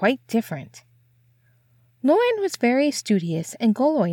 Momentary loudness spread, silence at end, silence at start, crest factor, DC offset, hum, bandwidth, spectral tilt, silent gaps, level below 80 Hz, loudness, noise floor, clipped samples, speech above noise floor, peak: 8 LU; 0 s; 0 s; 16 dB; under 0.1%; none; 18.5 kHz; -5.5 dB/octave; none; -76 dBFS; -22 LUFS; -61 dBFS; under 0.1%; 39 dB; -6 dBFS